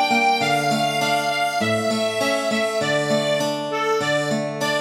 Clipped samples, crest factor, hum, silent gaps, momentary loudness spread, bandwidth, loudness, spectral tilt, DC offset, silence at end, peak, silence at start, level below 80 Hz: under 0.1%; 14 dB; none; none; 4 LU; 16 kHz; -20 LUFS; -3.5 dB/octave; under 0.1%; 0 s; -6 dBFS; 0 s; -68 dBFS